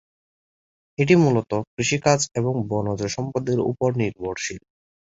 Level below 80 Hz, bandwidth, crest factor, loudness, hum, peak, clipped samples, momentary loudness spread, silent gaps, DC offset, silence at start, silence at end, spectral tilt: -54 dBFS; 8 kHz; 22 dB; -22 LUFS; none; -2 dBFS; under 0.1%; 11 LU; 1.67-1.77 s; under 0.1%; 1 s; 0.5 s; -5.5 dB/octave